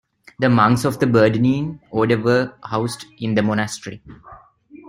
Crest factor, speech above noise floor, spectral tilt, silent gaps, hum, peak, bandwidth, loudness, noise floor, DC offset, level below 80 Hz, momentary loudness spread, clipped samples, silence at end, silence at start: 20 dB; 27 dB; -6.5 dB/octave; none; none; 0 dBFS; 15.5 kHz; -19 LUFS; -45 dBFS; under 0.1%; -52 dBFS; 12 LU; under 0.1%; 0 s; 0.4 s